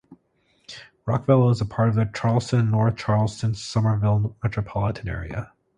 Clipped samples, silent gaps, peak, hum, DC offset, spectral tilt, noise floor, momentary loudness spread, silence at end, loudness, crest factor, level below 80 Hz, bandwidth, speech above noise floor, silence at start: under 0.1%; none; -6 dBFS; none; under 0.1%; -7.5 dB/octave; -65 dBFS; 14 LU; 0.3 s; -23 LUFS; 18 dB; -44 dBFS; 9.6 kHz; 44 dB; 0.1 s